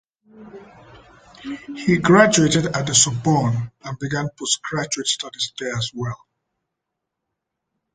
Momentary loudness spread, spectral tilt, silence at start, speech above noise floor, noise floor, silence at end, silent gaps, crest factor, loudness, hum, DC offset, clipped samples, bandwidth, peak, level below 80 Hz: 18 LU; -3.5 dB/octave; 0.35 s; 61 dB; -81 dBFS; 1.8 s; none; 20 dB; -19 LUFS; none; under 0.1%; under 0.1%; 9.6 kHz; -2 dBFS; -54 dBFS